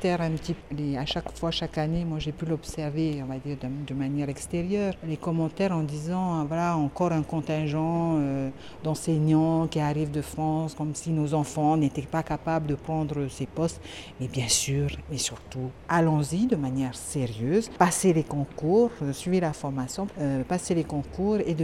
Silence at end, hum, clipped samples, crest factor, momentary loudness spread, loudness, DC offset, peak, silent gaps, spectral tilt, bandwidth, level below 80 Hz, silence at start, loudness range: 0 s; none; under 0.1%; 22 dB; 9 LU; -28 LUFS; under 0.1%; -6 dBFS; none; -5.5 dB/octave; 14.5 kHz; -48 dBFS; 0 s; 4 LU